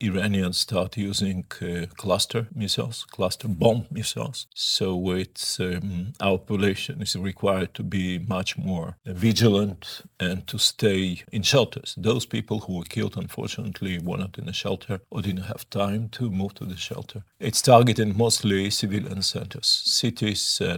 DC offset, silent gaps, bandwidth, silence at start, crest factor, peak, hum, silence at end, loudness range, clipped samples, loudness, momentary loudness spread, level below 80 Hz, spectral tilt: under 0.1%; none; 20 kHz; 0 s; 24 dB; -2 dBFS; none; 0 s; 8 LU; under 0.1%; -25 LUFS; 11 LU; -58 dBFS; -4.5 dB/octave